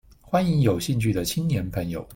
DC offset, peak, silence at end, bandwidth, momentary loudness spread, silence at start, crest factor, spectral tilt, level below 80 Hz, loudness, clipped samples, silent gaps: under 0.1%; -8 dBFS; 0 s; 17 kHz; 6 LU; 0.25 s; 16 dB; -6 dB/octave; -46 dBFS; -24 LUFS; under 0.1%; none